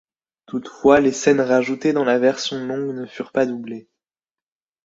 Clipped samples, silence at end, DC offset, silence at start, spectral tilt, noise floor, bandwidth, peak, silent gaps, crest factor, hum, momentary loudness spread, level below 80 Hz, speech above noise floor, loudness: under 0.1%; 1.05 s; under 0.1%; 0.5 s; -4.5 dB/octave; under -90 dBFS; 7.8 kHz; -2 dBFS; none; 18 dB; none; 15 LU; -58 dBFS; over 71 dB; -19 LUFS